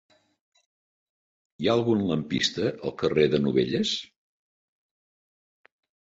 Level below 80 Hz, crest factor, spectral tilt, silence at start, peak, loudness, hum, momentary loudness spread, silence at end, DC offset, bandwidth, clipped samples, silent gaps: -60 dBFS; 22 dB; -5.5 dB/octave; 1.6 s; -8 dBFS; -25 LUFS; none; 7 LU; 2.05 s; under 0.1%; 8 kHz; under 0.1%; none